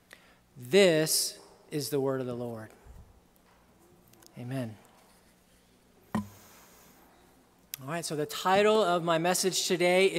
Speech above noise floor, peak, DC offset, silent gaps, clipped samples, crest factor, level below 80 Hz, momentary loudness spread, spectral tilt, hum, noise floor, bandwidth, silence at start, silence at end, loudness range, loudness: 35 dB; -10 dBFS; under 0.1%; none; under 0.1%; 20 dB; -66 dBFS; 21 LU; -3.5 dB/octave; none; -63 dBFS; 16 kHz; 0.55 s; 0 s; 16 LU; -28 LUFS